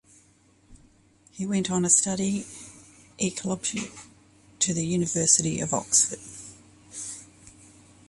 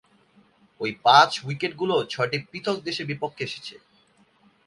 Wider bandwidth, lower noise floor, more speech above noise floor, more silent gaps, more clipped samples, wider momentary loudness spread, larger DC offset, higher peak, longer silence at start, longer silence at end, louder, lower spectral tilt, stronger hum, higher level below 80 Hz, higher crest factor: about the same, 11.5 kHz vs 11.5 kHz; about the same, -60 dBFS vs -61 dBFS; about the same, 35 dB vs 37 dB; neither; neither; first, 22 LU vs 16 LU; neither; about the same, -4 dBFS vs -2 dBFS; about the same, 0.7 s vs 0.8 s; second, 0.6 s vs 0.9 s; about the same, -24 LUFS vs -23 LUFS; about the same, -3.5 dB/octave vs -4 dB/octave; neither; first, -60 dBFS vs -68 dBFS; about the same, 26 dB vs 24 dB